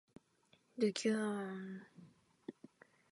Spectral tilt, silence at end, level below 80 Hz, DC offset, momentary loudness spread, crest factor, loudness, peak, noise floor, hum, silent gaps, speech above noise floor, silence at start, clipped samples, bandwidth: -5 dB/octave; 0.6 s; -88 dBFS; under 0.1%; 21 LU; 20 dB; -39 LUFS; -22 dBFS; -74 dBFS; none; none; 36 dB; 0.75 s; under 0.1%; 11.5 kHz